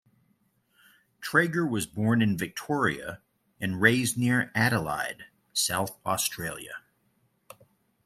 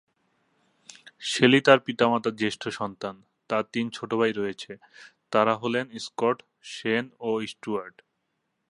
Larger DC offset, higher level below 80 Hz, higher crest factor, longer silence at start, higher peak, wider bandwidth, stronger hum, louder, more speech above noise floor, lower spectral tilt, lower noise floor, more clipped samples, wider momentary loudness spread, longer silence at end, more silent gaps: neither; first, -62 dBFS vs -70 dBFS; about the same, 24 dB vs 26 dB; about the same, 1.2 s vs 1.2 s; second, -6 dBFS vs -2 dBFS; first, 16 kHz vs 11.5 kHz; neither; about the same, -27 LUFS vs -26 LUFS; second, 43 dB vs 52 dB; about the same, -4 dB/octave vs -4.5 dB/octave; second, -70 dBFS vs -78 dBFS; neither; about the same, 16 LU vs 16 LU; first, 1.3 s vs 0.8 s; neither